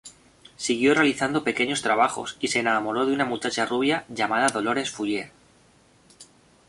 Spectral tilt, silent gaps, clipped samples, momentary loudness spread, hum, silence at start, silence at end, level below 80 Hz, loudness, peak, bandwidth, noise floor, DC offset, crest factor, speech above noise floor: -3.5 dB/octave; none; under 0.1%; 8 LU; none; 0.05 s; 0.45 s; -64 dBFS; -24 LUFS; -6 dBFS; 11.5 kHz; -58 dBFS; under 0.1%; 20 dB; 34 dB